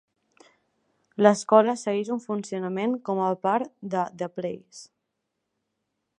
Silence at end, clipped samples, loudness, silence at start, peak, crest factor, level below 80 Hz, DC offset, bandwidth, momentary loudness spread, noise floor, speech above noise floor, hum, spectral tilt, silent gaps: 1.35 s; under 0.1%; -25 LUFS; 1.2 s; -2 dBFS; 24 dB; -78 dBFS; under 0.1%; 11 kHz; 15 LU; -81 dBFS; 56 dB; none; -5.5 dB/octave; none